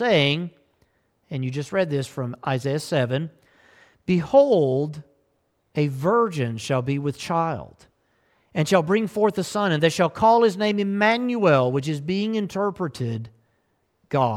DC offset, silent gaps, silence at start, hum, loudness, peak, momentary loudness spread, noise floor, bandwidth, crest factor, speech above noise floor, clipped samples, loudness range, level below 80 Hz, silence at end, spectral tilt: under 0.1%; none; 0 s; none; -22 LUFS; -6 dBFS; 12 LU; -69 dBFS; 15.5 kHz; 18 dB; 47 dB; under 0.1%; 5 LU; -60 dBFS; 0 s; -6 dB/octave